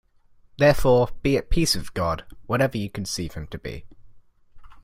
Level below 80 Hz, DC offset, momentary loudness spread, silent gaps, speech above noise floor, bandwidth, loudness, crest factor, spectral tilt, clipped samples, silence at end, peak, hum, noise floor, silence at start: -36 dBFS; under 0.1%; 16 LU; none; 33 dB; 16 kHz; -23 LUFS; 18 dB; -5 dB/octave; under 0.1%; 0.05 s; -6 dBFS; none; -55 dBFS; 0.6 s